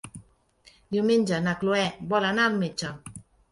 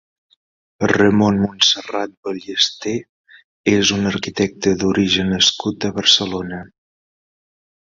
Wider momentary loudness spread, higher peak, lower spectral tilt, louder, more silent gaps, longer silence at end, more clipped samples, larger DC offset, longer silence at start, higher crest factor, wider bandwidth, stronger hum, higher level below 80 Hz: first, 16 LU vs 12 LU; second, -10 dBFS vs 0 dBFS; first, -5 dB/octave vs -3.5 dB/octave; second, -25 LUFS vs -17 LUFS; second, none vs 2.17-2.23 s, 3.09-3.24 s, 3.44-3.64 s; second, 0.3 s vs 1.2 s; neither; neither; second, 0.05 s vs 0.8 s; about the same, 18 dB vs 18 dB; first, 11.5 kHz vs 7.8 kHz; neither; second, -60 dBFS vs -48 dBFS